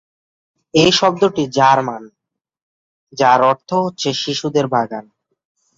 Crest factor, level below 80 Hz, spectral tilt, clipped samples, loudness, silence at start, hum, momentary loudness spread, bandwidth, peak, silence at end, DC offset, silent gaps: 16 dB; -56 dBFS; -4.5 dB/octave; under 0.1%; -15 LUFS; 0.75 s; none; 13 LU; 7.8 kHz; 0 dBFS; 0.75 s; under 0.1%; 2.62-3.07 s